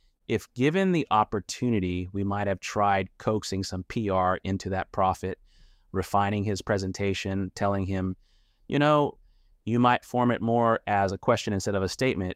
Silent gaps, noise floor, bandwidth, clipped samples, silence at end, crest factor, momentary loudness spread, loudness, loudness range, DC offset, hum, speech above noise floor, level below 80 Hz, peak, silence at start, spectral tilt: none; -54 dBFS; 15.5 kHz; under 0.1%; 0 s; 18 dB; 8 LU; -27 LUFS; 4 LU; under 0.1%; none; 28 dB; -54 dBFS; -8 dBFS; 0.3 s; -6 dB/octave